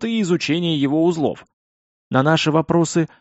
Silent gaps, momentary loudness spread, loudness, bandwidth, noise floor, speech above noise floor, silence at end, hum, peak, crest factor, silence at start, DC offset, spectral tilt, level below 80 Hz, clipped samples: 1.53-2.11 s; 6 LU; -19 LUFS; 8 kHz; under -90 dBFS; over 72 dB; 0.15 s; none; -2 dBFS; 16 dB; 0 s; under 0.1%; -5 dB/octave; -56 dBFS; under 0.1%